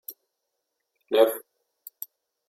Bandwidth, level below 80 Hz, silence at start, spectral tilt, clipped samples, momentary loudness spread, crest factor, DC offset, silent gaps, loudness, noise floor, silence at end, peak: 16.5 kHz; under -90 dBFS; 0.1 s; -2 dB/octave; under 0.1%; 25 LU; 22 dB; under 0.1%; none; -23 LUFS; -81 dBFS; 1.1 s; -6 dBFS